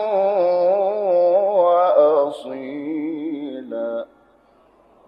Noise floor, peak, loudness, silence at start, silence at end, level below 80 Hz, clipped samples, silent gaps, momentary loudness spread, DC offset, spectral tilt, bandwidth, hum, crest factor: -55 dBFS; -4 dBFS; -19 LUFS; 0 s; 1.05 s; -70 dBFS; under 0.1%; none; 15 LU; under 0.1%; -7 dB/octave; 5.4 kHz; none; 16 dB